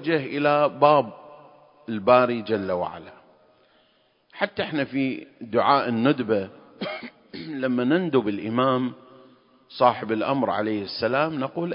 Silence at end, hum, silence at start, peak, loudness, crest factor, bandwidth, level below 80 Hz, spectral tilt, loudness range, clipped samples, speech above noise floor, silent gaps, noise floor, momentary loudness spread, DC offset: 0 s; none; 0 s; -2 dBFS; -23 LUFS; 22 dB; 5.4 kHz; -64 dBFS; -10.5 dB/octave; 4 LU; under 0.1%; 41 dB; none; -64 dBFS; 16 LU; under 0.1%